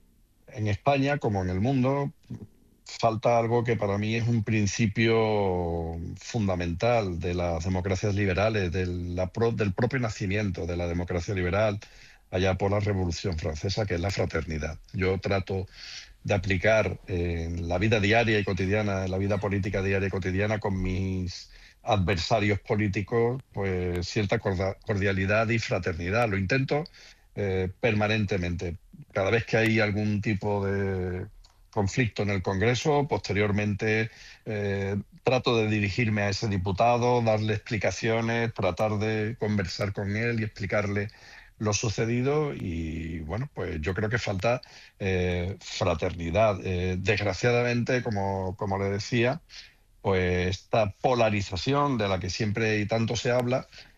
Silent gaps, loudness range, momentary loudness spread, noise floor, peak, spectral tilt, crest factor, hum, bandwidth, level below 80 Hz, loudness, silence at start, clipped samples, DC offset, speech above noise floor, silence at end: none; 3 LU; 9 LU; -57 dBFS; -10 dBFS; -6 dB/octave; 18 dB; none; 7.8 kHz; -48 dBFS; -27 LUFS; 0.5 s; under 0.1%; under 0.1%; 31 dB; 0.15 s